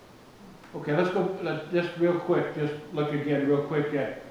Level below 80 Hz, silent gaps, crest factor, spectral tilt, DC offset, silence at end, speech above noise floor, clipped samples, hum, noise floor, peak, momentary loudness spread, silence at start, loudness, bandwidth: -64 dBFS; none; 16 dB; -8 dB/octave; under 0.1%; 0 s; 23 dB; under 0.1%; none; -50 dBFS; -12 dBFS; 6 LU; 0 s; -28 LUFS; 11.5 kHz